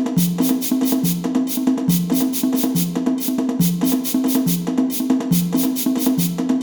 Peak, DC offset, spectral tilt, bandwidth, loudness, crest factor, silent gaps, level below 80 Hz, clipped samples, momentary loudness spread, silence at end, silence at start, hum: -4 dBFS; under 0.1%; -5.5 dB/octave; over 20 kHz; -19 LUFS; 14 dB; none; -52 dBFS; under 0.1%; 2 LU; 0 s; 0 s; none